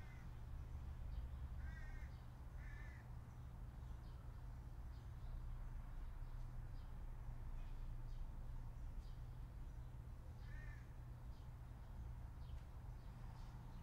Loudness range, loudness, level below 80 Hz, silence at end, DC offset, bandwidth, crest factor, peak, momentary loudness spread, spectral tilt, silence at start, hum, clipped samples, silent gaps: 2 LU; -56 LUFS; -52 dBFS; 0 s; under 0.1%; 15.5 kHz; 14 dB; -38 dBFS; 4 LU; -7 dB/octave; 0 s; none; under 0.1%; none